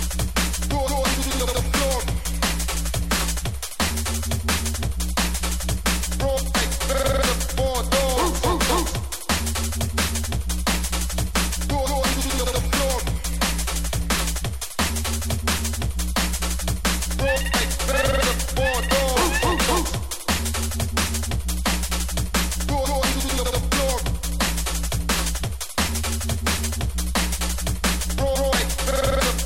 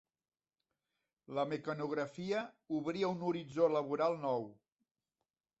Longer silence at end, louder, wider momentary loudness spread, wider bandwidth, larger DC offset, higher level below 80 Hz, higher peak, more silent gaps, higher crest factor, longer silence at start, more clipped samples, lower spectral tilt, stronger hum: second, 0 s vs 1.05 s; first, -23 LUFS vs -37 LUFS; about the same, 5 LU vs 7 LU; first, 16.5 kHz vs 8 kHz; first, 1% vs under 0.1%; first, -26 dBFS vs -80 dBFS; first, -6 dBFS vs -18 dBFS; neither; about the same, 16 dB vs 20 dB; second, 0 s vs 1.3 s; neither; second, -3.5 dB/octave vs -5.5 dB/octave; neither